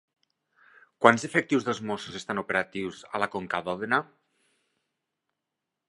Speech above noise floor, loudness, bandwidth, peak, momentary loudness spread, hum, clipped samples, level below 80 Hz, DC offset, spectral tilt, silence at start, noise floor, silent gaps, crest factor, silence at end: 58 dB; -27 LUFS; 11.5 kHz; 0 dBFS; 12 LU; none; under 0.1%; -68 dBFS; under 0.1%; -4.5 dB/octave; 1 s; -85 dBFS; none; 30 dB; 1.85 s